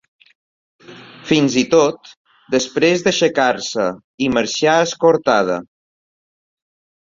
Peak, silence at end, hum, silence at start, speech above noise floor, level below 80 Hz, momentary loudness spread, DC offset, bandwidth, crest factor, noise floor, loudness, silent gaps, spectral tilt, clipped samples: -2 dBFS; 1.4 s; none; 0.9 s; 22 dB; -56 dBFS; 8 LU; under 0.1%; 7.6 kHz; 16 dB; -38 dBFS; -16 LUFS; 2.17-2.25 s, 4.04-4.18 s; -4 dB/octave; under 0.1%